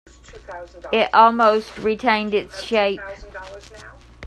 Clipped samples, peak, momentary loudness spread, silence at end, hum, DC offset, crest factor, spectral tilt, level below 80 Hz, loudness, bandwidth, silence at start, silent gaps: under 0.1%; 0 dBFS; 23 LU; 0 s; none; under 0.1%; 20 dB; -4.5 dB/octave; -48 dBFS; -18 LUFS; 12 kHz; 0.3 s; none